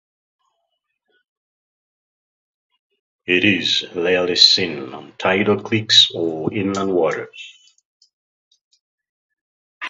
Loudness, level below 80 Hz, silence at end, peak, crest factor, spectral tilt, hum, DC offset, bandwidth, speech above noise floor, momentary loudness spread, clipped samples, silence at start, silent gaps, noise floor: -16 LUFS; -58 dBFS; 0 s; 0 dBFS; 22 dB; -3.5 dB/octave; none; under 0.1%; 8 kHz; 56 dB; 18 LU; under 0.1%; 3.3 s; 7.85-8.00 s, 8.13-8.51 s, 8.61-8.71 s, 8.81-8.98 s, 9.09-9.81 s; -74 dBFS